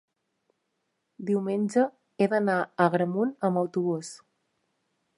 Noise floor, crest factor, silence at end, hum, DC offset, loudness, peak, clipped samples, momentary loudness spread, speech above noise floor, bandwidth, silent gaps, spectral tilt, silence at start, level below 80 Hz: -78 dBFS; 22 dB; 1 s; none; under 0.1%; -27 LUFS; -6 dBFS; under 0.1%; 6 LU; 52 dB; 11.5 kHz; none; -7 dB/octave; 1.2 s; -78 dBFS